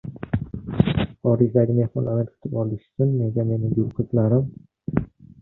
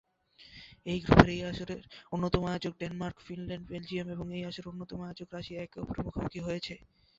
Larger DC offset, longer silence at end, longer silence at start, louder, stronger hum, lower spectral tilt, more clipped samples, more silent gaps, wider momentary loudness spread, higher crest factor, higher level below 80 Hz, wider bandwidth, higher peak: neither; about the same, 0.35 s vs 0.4 s; second, 0.05 s vs 0.4 s; first, -23 LUFS vs -33 LUFS; neither; first, -12 dB/octave vs -5.5 dB/octave; neither; neither; second, 9 LU vs 18 LU; second, 18 dB vs 32 dB; about the same, -44 dBFS vs -46 dBFS; second, 4.1 kHz vs 7.8 kHz; about the same, -4 dBFS vs -2 dBFS